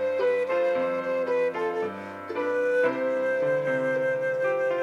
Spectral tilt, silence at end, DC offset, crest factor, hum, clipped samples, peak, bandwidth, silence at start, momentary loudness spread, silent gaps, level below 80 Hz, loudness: -6 dB/octave; 0 s; under 0.1%; 14 dB; none; under 0.1%; -12 dBFS; 7.2 kHz; 0 s; 6 LU; none; -78 dBFS; -26 LUFS